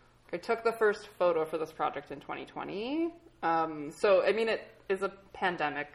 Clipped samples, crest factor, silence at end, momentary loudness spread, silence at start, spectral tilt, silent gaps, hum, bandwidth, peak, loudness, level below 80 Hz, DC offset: under 0.1%; 16 dB; 0.05 s; 13 LU; 0.3 s; -5 dB/octave; none; none; 15 kHz; -16 dBFS; -32 LUFS; -66 dBFS; under 0.1%